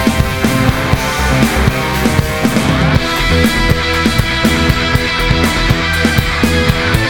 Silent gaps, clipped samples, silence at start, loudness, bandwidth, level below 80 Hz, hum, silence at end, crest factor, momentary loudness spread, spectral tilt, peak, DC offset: none; under 0.1%; 0 s; -12 LUFS; 19.5 kHz; -20 dBFS; none; 0 s; 12 dB; 2 LU; -5 dB/octave; 0 dBFS; under 0.1%